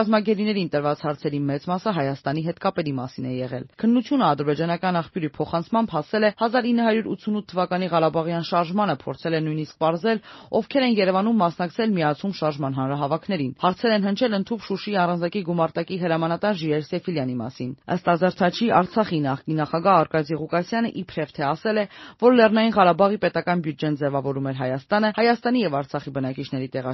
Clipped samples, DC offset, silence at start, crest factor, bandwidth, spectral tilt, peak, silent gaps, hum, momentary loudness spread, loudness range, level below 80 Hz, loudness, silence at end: under 0.1%; under 0.1%; 0 s; 20 dB; 6 kHz; -5 dB/octave; -4 dBFS; none; none; 9 LU; 4 LU; -62 dBFS; -23 LUFS; 0 s